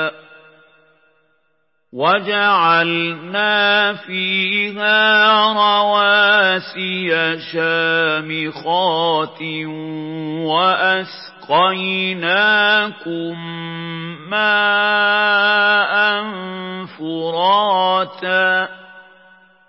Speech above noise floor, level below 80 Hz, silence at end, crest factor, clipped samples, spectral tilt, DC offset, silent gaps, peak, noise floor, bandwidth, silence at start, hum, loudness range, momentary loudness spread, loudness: 51 dB; -78 dBFS; 0.7 s; 16 dB; under 0.1%; -8.5 dB/octave; under 0.1%; none; -2 dBFS; -67 dBFS; 5.8 kHz; 0 s; none; 5 LU; 14 LU; -15 LUFS